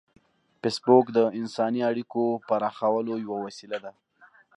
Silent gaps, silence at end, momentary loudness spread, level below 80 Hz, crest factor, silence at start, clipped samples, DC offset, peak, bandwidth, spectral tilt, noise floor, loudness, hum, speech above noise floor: none; 0.65 s; 15 LU; -76 dBFS; 20 dB; 0.65 s; under 0.1%; under 0.1%; -6 dBFS; 11 kHz; -6 dB/octave; -58 dBFS; -26 LUFS; none; 32 dB